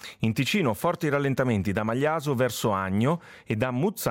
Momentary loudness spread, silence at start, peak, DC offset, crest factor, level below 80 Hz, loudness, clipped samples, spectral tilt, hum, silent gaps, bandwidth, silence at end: 3 LU; 0 s; -12 dBFS; under 0.1%; 14 dB; -58 dBFS; -26 LUFS; under 0.1%; -6 dB/octave; none; none; 17 kHz; 0 s